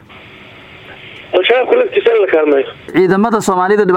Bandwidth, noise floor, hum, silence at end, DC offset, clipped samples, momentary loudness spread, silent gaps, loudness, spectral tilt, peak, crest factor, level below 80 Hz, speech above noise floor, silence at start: 15.5 kHz; -37 dBFS; none; 0 s; under 0.1%; under 0.1%; 9 LU; none; -12 LUFS; -5 dB/octave; 0 dBFS; 12 dB; -52 dBFS; 25 dB; 0.1 s